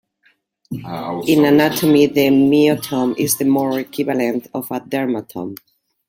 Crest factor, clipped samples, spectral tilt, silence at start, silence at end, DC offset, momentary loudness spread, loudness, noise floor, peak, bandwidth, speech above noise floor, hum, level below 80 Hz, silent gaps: 16 dB; under 0.1%; -5 dB/octave; 0.7 s; 0.5 s; under 0.1%; 15 LU; -16 LUFS; -60 dBFS; -2 dBFS; 17 kHz; 44 dB; none; -58 dBFS; none